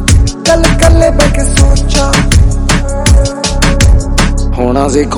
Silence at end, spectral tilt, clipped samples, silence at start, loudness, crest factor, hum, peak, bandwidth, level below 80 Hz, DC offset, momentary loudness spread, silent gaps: 0 s; -4.5 dB/octave; 5%; 0 s; -9 LUFS; 8 dB; none; 0 dBFS; 17.5 kHz; -10 dBFS; under 0.1%; 5 LU; none